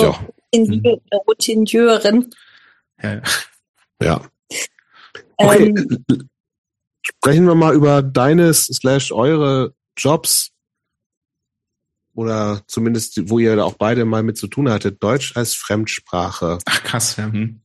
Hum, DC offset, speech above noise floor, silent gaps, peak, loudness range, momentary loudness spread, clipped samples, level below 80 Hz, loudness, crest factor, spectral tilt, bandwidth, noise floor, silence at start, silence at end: none; under 0.1%; 65 dB; 3.69-3.74 s, 4.39-4.43 s, 6.40-6.44 s, 6.58-6.64 s, 11.06-11.10 s, 11.17-11.21 s; 0 dBFS; 7 LU; 13 LU; under 0.1%; -48 dBFS; -16 LUFS; 16 dB; -5 dB/octave; 12.5 kHz; -80 dBFS; 0 s; 0.1 s